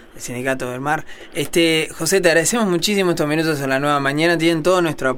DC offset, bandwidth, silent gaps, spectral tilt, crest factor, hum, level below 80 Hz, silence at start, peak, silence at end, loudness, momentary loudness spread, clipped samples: under 0.1%; 17.5 kHz; none; -4 dB/octave; 16 dB; none; -46 dBFS; 0.15 s; -2 dBFS; 0 s; -18 LUFS; 8 LU; under 0.1%